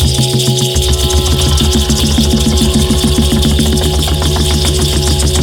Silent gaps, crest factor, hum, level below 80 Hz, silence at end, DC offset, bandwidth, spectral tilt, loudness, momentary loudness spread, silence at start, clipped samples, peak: none; 10 dB; none; -16 dBFS; 0 s; under 0.1%; 18.5 kHz; -4.5 dB/octave; -11 LUFS; 1 LU; 0 s; under 0.1%; 0 dBFS